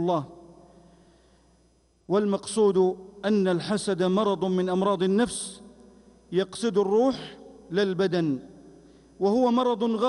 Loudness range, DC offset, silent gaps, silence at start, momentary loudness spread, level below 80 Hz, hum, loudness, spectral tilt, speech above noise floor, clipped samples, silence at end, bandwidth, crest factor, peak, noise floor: 3 LU; under 0.1%; none; 0 s; 10 LU; -62 dBFS; none; -25 LUFS; -6 dB/octave; 39 dB; under 0.1%; 0 s; 11.5 kHz; 14 dB; -12 dBFS; -63 dBFS